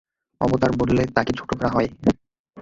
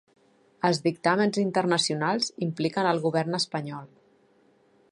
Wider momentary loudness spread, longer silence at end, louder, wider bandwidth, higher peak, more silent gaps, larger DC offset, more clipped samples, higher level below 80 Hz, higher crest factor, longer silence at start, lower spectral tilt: about the same, 6 LU vs 6 LU; second, 0 s vs 1.05 s; first, -22 LUFS vs -26 LUFS; second, 7.8 kHz vs 11.5 kHz; first, -2 dBFS vs -8 dBFS; first, 2.39-2.44 s vs none; neither; neither; first, -42 dBFS vs -74 dBFS; about the same, 20 dB vs 18 dB; second, 0.4 s vs 0.65 s; first, -7 dB/octave vs -4.5 dB/octave